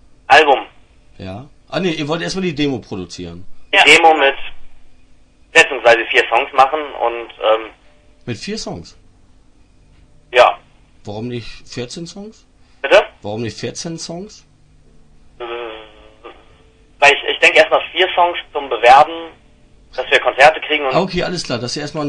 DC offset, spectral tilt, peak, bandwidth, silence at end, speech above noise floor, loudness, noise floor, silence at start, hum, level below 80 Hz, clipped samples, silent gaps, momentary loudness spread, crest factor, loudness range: under 0.1%; -3.5 dB/octave; 0 dBFS; 12 kHz; 0 s; 33 dB; -13 LUFS; -48 dBFS; 0.3 s; none; -46 dBFS; 0.1%; none; 22 LU; 16 dB; 10 LU